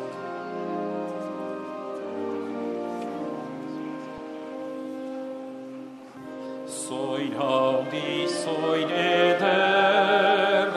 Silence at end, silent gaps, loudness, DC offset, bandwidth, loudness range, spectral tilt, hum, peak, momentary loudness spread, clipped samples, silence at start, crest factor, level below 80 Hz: 0 s; none; -26 LUFS; under 0.1%; 13 kHz; 13 LU; -4 dB/octave; none; -8 dBFS; 17 LU; under 0.1%; 0 s; 18 dB; -72 dBFS